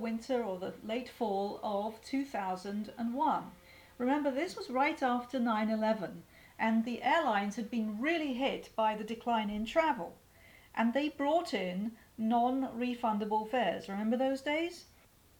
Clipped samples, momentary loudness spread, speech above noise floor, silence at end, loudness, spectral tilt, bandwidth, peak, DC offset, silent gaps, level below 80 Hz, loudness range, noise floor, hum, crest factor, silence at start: under 0.1%; 8 LU; 26 dB; 0.55 s; -34 LUFS; -5.5 dB/octave; 19 kHz; -16 dBFS; under 0.1%; none; -66 dBFS; 3 LU; -60 dBFS; none; 18 dB; 0 s